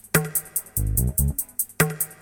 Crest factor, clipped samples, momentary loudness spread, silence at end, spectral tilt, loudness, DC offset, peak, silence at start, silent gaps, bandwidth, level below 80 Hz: 22 dB; under 0.1%; 4 LU; 0.1 s; -4 dB/octave; -24 LUFS; under 0.1%; -2 dBFS; 0.15 s; none; over 20 kHz; -32 dBFS